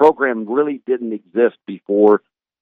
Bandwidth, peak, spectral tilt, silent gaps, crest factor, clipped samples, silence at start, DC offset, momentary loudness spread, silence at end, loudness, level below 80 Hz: 4.5 kHz; -2 dBFS; -8 dB/octave; none; 16 dB; under 0.1%; 0 s; under 0.1%; 9 LU; 0.45 s; -17 LUFS; -64 dBFS